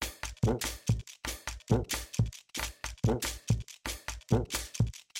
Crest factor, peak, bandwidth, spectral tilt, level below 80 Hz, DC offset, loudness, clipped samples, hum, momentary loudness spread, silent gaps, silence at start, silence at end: 20 dB; -12 dBFS; 16.5 kHz; -5 dB/octave; -42 dBFS; under 0.1%; -34 LUFS; under 0.1%; none; 8 LU; none; 0 s; 0 s